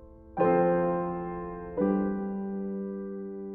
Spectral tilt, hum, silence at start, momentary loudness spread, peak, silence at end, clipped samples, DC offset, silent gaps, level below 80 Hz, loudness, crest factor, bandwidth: -9.5 dB/octave; none; 0 s; 13 LU; -12 dBFS; 0 s; under 0.1%; under 0.1%; none; -54 dBFS; -30 LUFS; 18 dB; 3.4 kHz